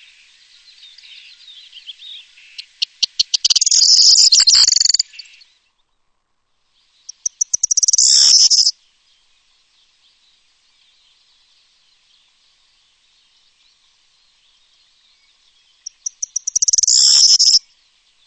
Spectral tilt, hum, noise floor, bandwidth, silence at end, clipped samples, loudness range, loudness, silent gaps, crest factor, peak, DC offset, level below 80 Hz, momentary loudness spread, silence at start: 5.5 dB/octave; none; -66 dBFS; 9 kHz; 0.7 s; under 0.1%; 12 LU; -10 LUFS; none; 18 dB; 0 dBFS; under 0.1%; -60 dBFS; 18 LU; 1.9 s